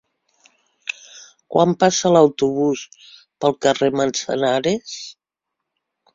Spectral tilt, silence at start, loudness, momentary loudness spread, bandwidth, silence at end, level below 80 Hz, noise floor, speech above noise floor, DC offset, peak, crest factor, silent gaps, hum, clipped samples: -4.5 dB/octave; 0.85 s; -19 LUFS; 18 LU; 7.8 kHz; 1.05 s; -60 dBFS; -82 dBFS; 64 dB; under 0.1%; -2 dBFS; 20 dB; none; none; under 0.1%